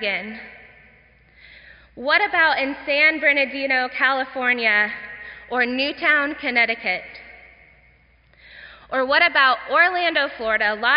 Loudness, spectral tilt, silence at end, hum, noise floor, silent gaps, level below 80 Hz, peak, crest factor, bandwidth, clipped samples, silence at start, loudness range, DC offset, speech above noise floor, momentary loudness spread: -19 LUFS; 1.5 dB/octave; 0 s; none; -55 dBFS; none; -58 dBFS; -4 dBFS; 18 dB; 5.4 kHz; under 0.1%; 0 s; 4 LU; under 0.1%; 35 dB; 12 LU